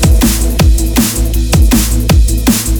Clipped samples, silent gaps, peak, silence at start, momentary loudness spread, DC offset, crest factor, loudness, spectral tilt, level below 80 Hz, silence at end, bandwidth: under 0.1%; none; 0 dBFS; 0 s; 3 LU; under 0.1%; 8 dB; -11 LUFS; -4.5 dB/octave; -10 dBFS; 0 s; over 20 kHz